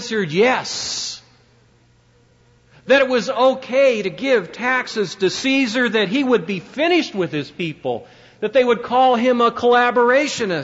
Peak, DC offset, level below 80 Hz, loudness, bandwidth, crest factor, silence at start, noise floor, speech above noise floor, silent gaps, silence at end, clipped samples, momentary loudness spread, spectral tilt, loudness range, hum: -4 dBFS; under 0.1%; -60 dBFS; -18 LUFS; 8 kHz; 14 dB; 0 s; -55 dBFS; 37 dB; none; 0 s; under 0.1%; 10 LU; -4 dB/octave; 4 LU; none